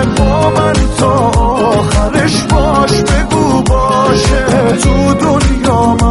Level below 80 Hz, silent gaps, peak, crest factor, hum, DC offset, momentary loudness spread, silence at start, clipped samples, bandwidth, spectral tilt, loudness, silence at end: -16 dBFS; none; 0 dBFS; 10 dB; none; under 0.1%; 1 LU; 0 s; under 0.1%; 12 kHz; -5.5 dB/octave; -10 LUFS; 0 s